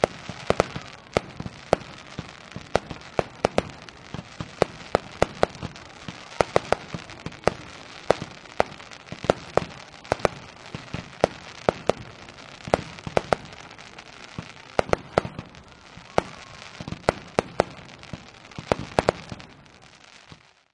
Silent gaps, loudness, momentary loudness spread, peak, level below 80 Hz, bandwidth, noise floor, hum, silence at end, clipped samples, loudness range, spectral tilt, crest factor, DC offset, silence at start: none; -28 LUFS; 17 LU; 0 dBFS; -48 dBFS; 11.5 kHz; -51 dBFS; none; 0.35 s; under 0.1%; 3 LU; -5 dB/octave; 30 dB; under 0.1%; 0 s